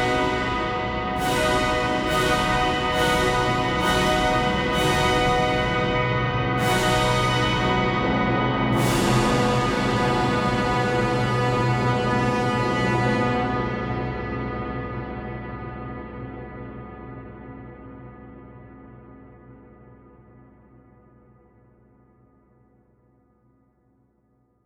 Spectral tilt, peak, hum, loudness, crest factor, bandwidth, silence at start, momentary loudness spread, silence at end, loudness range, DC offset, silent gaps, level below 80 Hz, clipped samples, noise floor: -5 dB/octave; -8 dBFS; none; -22 LUFS; 16 dB; over 20 kHz; 0 s; 17 LU; 4.8 s; 17 LU; under 0.1%; none; -38 dBFS; under 0.1%; -65 dBFS